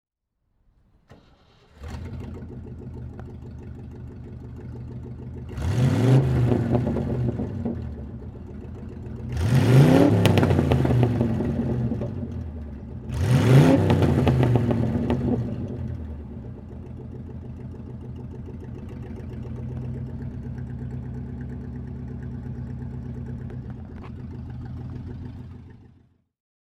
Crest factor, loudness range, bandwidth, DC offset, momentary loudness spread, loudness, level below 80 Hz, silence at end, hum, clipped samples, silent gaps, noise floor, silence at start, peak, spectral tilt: 24 dB; 18 LU; 13 kHz; under 0.1%; 20 LU; -23 LUFS; -40 dBFS; 0.95 s; none; under 0.1%; none; -74 dBFS; 1.1 s; 0 dBFS; -8 dB/octave